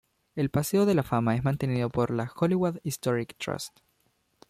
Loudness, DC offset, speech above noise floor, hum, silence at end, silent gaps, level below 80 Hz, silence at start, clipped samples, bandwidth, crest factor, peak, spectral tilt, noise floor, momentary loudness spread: -28 LUFS; under 0.1%; 44 dB; none; 0.8 s; none; -56 dBFS; 0.35 s; under 0.1%; 15.5 kHz; 16 dB; -12 dBFS; -6.5 dB/octave; -71 dBFS; 10 LU